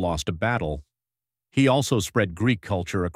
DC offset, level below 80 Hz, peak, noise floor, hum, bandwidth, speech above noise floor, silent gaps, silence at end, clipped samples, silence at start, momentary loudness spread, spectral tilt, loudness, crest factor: under 0.1%; -44 dBFS; -6 dBFS; under -90 dBFS; none; 16 kHz; over 67 dB; none; 0.05 s; under 0.1%; 0 s; 8 LU; -5.5 dB/octave; -24 LUFS; 18 dB